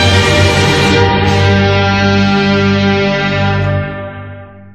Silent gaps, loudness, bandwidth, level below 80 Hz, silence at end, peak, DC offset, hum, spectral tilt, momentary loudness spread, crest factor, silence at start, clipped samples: none; -10 LUFS; 12.5 kHz; -32 dBFS; 0.05 s; 0 dBFS; under 0.1%; 50 Hz at -30 dBFS; -5.5 dB/octave; 12 LU; 10 dB; 0 s; under 0.1%